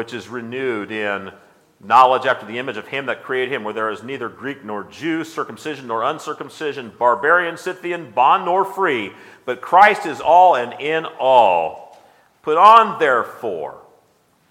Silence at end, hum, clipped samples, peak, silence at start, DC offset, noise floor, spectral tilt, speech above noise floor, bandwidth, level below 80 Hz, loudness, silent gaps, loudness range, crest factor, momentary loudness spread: 0.7 s; none; under 0.1%; 0 dBFS; 0 s; under 0.1%; -59 dBFS; -4.5 dB/octave; 41 dB; 15.5 kHz; -68 dBFS; -17 LUFS; none; 10 LU; 18 dB; 17 LU